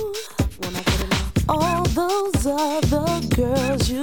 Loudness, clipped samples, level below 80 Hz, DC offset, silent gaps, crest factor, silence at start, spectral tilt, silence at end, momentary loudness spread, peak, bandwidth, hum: -22 LUFS; under 0.1%; -30 dBFS; 0.8%; none; 16 dB; 0 s; -5 dB/octave; 0 s; 5 LU; -6 dBFS; 17.5 kHz; none